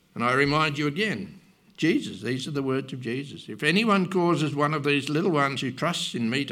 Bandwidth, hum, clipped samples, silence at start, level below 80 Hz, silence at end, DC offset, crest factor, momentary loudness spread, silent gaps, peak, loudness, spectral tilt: 15.5 kHz; none; under 0.1%; 0.15 s; -62 dBFS; 0 s; under 0.1%; 18 dB; 10 LU; none; -8 dBFS; -25 LUFS; -5.5 dB/octave